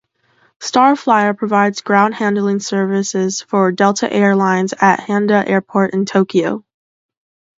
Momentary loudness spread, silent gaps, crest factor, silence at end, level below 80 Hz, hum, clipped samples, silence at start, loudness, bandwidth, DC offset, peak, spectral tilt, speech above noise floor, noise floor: 5 LU; none; 16 dB; 1 s; -64 dBFS; none; under 0.1%; 0.6 s; -15 LUFS; 7.8 kHz; under 0.1%; 0 dBFS; -5 dB/octave; 43 dB; -57 dBFS